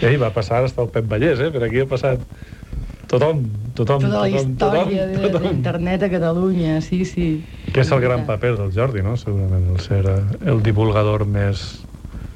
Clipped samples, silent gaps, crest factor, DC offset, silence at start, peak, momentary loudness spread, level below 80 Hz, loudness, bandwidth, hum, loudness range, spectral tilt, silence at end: under 0.1%; none; 16 dB; under 0.1%; 0 s; -2 dBFS; 9 LU; -36 dBFS; -19 LUFS; 9.6 kHz; none; 1 LU; -8 dB/octave; 0 s